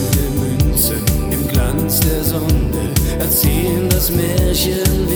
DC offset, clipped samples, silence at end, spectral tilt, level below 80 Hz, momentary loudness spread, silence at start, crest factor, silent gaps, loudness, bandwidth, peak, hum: under 0.1%; under 0.1%; 0 s; -5 dB/octave; -20 dBFS; 4 LU; 0 s; 14 dB; none; -16 LUFS; over 20 kHz; 0 dBFS; none